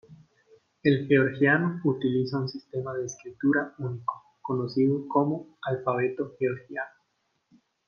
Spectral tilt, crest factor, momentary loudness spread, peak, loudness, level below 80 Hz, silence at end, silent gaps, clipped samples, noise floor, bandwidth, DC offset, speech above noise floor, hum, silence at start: -7 dB/octave; 20 dB; 12 LU; -8 dBFS; -27 LUFS; -70 dBFS; 1 s; none; under 0.1%; -75 dBFS; 6.8 kHz; under 0.1%; 48 dB; none; 0.1 s